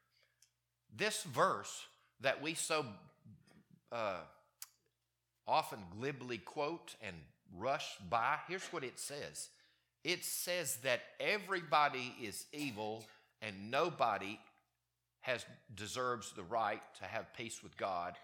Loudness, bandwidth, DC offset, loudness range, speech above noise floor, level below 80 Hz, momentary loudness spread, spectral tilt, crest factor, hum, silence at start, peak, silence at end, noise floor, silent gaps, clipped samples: -40 LUFS; 19 kHz; under 0.1%; 5 LU; 47 dB; -80 dBFS; 15 LU; -3 dB/octave; 24 dB; none; 0.9 s; -16 dBFS; 0 s; -87 dBFS; none; under 0.1%